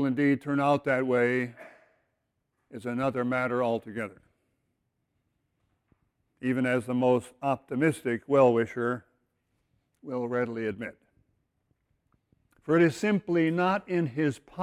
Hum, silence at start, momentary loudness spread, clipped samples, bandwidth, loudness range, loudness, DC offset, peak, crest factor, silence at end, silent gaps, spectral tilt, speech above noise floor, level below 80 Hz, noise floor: none; 0 s; 13 LU; under 0.1%; 13.5 kHz; 9 LU; -28 LUFS; under 0.1%; -10 dBFS; 20 dB; 0 s; none; -7 dB/octave; 52 dB; -68 dBFS; -79 dBFS